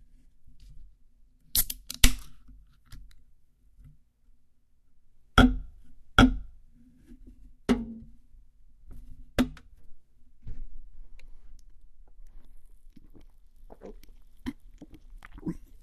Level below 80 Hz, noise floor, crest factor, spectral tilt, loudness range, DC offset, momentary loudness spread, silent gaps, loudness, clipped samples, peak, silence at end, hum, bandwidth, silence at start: -36 dBFS; -59 dBFS; 30 dB; -4 dB/octave; 20 LU; under 0.1%; 30 LU; none; -27 LUFS; under 0.1%; -2 dBFS; 0.25 s; none; 13.5 kHz; 0.45 s